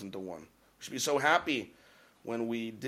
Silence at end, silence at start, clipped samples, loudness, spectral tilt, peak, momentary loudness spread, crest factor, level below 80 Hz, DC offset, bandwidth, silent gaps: 0 s; 0 s; under 0.1%; -32 LUFS; -3 dB/octave; -12 dBFS; 21 LU; 22 dB; -72 dBFS; under 0.1%; 16 kHz; none